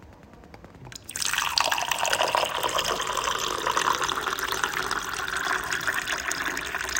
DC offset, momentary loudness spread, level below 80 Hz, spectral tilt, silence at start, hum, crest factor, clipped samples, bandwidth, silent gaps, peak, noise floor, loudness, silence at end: under 0.1%; 6 LU; -52 dBFS; -0.5 dB/octave; 0 s; none; 26 dB; under 0.1%; 17 kHz; none; -2 dBFS; -48 dBFS; -26 LUFS; 0 s